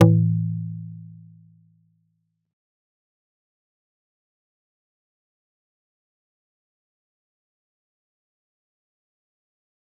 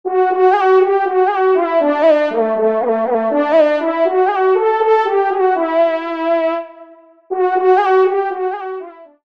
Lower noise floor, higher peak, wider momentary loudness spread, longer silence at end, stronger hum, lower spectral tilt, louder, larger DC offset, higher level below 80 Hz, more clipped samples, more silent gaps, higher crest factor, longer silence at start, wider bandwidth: first, -72 dBFS vs -42 dBFS; about the same, -2 dBFS vs -2 dBFS; first, 24 LU vs 8 LU; first, 8.95 s vs 0.2 s; neither; first, -10 dB/octave vs -6 dB/octave; second, -23 LUFS vs -14 LUFS; second, under 0.1% vs 0.2%; about the same, -64 dBFS vs -68 dBFS; neither; neither; first, 28 dB vs 12 dB; about the same, 0 s vs 0.05 s; second, 3.3 kHz vs 6 kHz